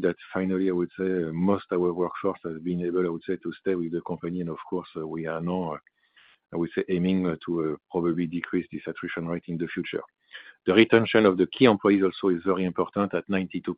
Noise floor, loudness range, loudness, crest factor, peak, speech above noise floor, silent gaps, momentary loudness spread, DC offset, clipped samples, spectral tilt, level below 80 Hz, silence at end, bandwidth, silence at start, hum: -60 dBFS; 8 LU; -26 LUFS; 22 dB; -4 dBFS; 34 dB; none; 13 LU; under 0.1%; under 0.1%; -10.5 dB/octave; -66 dBFS; 0 s; 5 kHz; 0 s; none